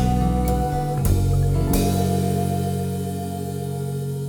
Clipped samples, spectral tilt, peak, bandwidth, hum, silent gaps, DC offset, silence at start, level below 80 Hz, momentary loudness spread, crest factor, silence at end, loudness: under 0.1%; -7 dB/octave; -8 dBFS; over 20 kHz; none; none; under 0.1%; 0 s; -28 dBFS; 7 LU; 14 dB; 0 s; -22 LUFS